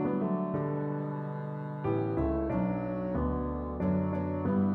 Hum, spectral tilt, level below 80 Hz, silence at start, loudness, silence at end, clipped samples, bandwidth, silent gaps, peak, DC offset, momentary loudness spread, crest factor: none; -12 dB/octave; -44 dBFS; 0 s; -32 LUFS; 0 s; under 0.1%; 4.2 kHz; none; -16 dBFS; under 0.1%; 5 LU; 14 dB